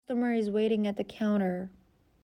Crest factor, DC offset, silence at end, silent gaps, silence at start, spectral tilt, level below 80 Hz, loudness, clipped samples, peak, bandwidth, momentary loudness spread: 12 dB; under 0.1%; 0.55 s; none; 0.1 s; -8 dB/octave; -68 dBFS; -30 LUFS; under 0.1%; -18 dBFS; 10 kHz; 7 LU